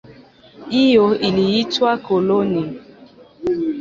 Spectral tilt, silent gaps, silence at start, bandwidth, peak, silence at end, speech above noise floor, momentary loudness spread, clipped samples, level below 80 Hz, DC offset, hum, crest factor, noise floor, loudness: -6.5 dB/octave; none; 0.1 s; 7.6 kHz; -2 dBFS; 0 s; 28 dB; 11 LU; under 0.1%; -54 dBFS; under 0.1%; none; 16 dB; -45 dBFS; -17 LUFS